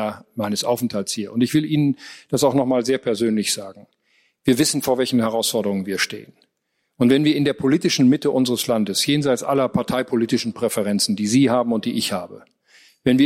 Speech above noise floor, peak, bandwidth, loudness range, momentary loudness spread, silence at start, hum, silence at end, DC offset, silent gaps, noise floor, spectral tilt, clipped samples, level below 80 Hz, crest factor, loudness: 53 dB; -4 dBFS; 16 kHz; 3 LU; 8 LU; 0 s; none; 0 s; under 0.1%; none; -73 dBFS; -4.5 dB/octave; under 0.1%; -58 dBFS; 16 dB; -20 LUFS